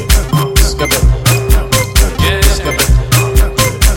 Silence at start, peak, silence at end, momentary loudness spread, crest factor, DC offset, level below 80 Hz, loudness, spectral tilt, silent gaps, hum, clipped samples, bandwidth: 0 s; 0 dBFS; 0 s; 2 LU; 10 dB; under 0.1%; -12 dBFS; -11 LUFS; -4 dB/octave; none; none; under 0.1%; 17.5 kHz